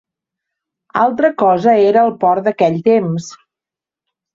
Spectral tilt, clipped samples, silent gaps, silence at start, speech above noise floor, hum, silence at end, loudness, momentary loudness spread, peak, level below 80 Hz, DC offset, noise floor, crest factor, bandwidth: -7 dB/octave; under 0.1%; none; 0.95 s; 75 dB; none; 1 s; -13 LUFS; 11 LU; -2 dBFS; -60 dBFS; under 0.1%; -88 dBFS; 14 dB; 7.6 kHz